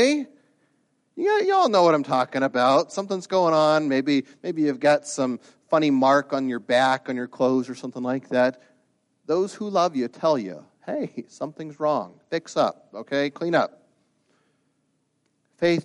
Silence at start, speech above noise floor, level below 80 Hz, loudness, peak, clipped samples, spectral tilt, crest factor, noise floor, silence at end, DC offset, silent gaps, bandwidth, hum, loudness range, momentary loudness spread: 0 s; 49 dB; -74 dBFS; -23 LUFS; -6 dBFS; under 0.1%; -5 dB/octave; 16 dB; -71 dBFS; 0 s; under 0.1%; none; 11 kHz; none; 7 LU; 13 LU